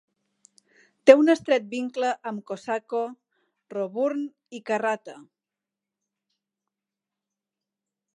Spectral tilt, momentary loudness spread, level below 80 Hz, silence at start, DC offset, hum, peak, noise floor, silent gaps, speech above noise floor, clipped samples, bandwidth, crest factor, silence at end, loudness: -5 dB/octave; 18 LU; -80 dBFS; 1.05 s; under 0.1%; none; 0 dBFS; -89 dBFS; none; 65 dB; under 0.1%; 10.5 kHz; 26 dB; 2.95 s; -24 LUFS